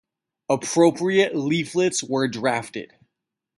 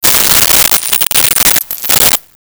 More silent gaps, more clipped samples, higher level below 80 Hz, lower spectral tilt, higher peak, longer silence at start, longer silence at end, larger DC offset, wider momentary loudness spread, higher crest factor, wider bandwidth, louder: neither; neither; second, -66 dBFS vs -36 dBFS; first, -4.5 dB/octave vs 0 dB/octave; second, -4 dBFS vs 0 dBFS; first, 0.5 s vs 0 s; first, 0.75 s vs 0.35 s; neither; first, 13 LU vs 5 LU; first, 18 dB vs 10 dB; second, 11.5 kHz vs over 20 kHz; second, -22 LUFS vs -6 LUFS